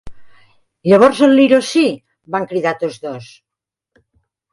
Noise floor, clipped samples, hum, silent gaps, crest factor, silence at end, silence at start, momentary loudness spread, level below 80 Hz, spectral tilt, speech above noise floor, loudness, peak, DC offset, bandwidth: -84 dBFS; under 0.1%; none; none; 16 dB; 1.3 s; 0.05 s; 19 LU; -52 dBFS; -5.5 dB/octave; 71 dB; -14 LUFS; 0 dBFS; under 0.1%; 11.5 kHz